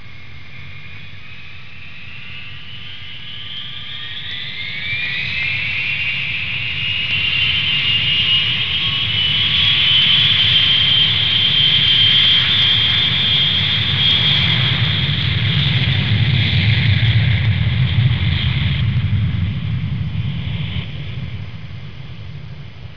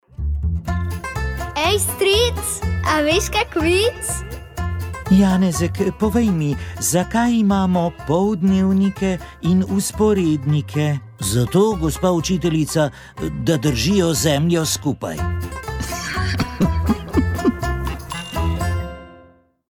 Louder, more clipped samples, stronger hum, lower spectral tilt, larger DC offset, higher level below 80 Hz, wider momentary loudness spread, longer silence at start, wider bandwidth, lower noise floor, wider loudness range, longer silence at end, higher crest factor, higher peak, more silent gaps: first, -14 LUFS vs -19 LUFS; neither; neither; about the same, -5.5 dB/octave vs -5 dB/octave; first, 3% vs under 0.1%; about the same, -36 dBFS vs -32 dBFS; first, 23 LU vs 10 LU; second, 0 s vs 0.2 s; second, 5.4 kHz vs 18.5 kHz; second, -38 dBFS vs -50 dBFS; first, 16 LU vs 4 LU; second, 0 s vs 0.55 s; about the same, 14 dB vs 14 dB; about the same, -2 dBFS vs -4 dBFS; neither